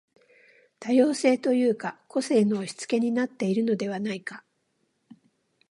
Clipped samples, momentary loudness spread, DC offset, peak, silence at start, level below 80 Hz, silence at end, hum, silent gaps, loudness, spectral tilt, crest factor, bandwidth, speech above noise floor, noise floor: under 0.1%; 11 LU; under 0.1%; -8 dBFS; 0.8 s; -78 dBFS; 1.3 s; none; none; -25 LUFS; -5.5 dB/octave; 18 dB; 11.5 kHz; 49 dB; -73 dBFS